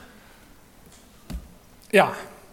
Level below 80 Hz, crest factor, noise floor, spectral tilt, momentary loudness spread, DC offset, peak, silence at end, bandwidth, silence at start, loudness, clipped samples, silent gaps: -48 dBFS; 26 dB; -51 dBFS; -4.5 dB/octave; 20 LU; under 0.1%; -2 dBFS; 0.2 s; 17.5 kHz; 1.3 s; -21 LUFS; under 0.1%; none